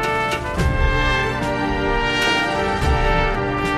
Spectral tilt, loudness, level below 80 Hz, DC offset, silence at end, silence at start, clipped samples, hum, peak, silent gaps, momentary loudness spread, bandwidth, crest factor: -5 dB/octave; -19 LUFS; -24 dBFS; under 0.1%; 0 s; 0 s; under 0.1%; none; -4 dBFS; none; 4 LU; 14.5 kHz; 14 dB